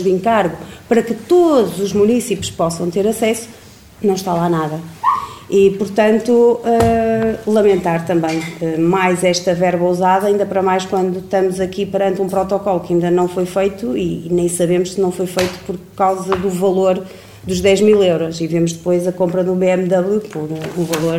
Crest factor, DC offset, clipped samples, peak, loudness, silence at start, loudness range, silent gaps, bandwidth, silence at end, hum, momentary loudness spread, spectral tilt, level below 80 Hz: 14 dB; 0.1%; under 0.1%; 0 dBFS; -16 LUFS; 0 s; 3 LU; none; 16.5 kHz; 0 s; none; 7 LU; -6 dB/octave; -44 dBFS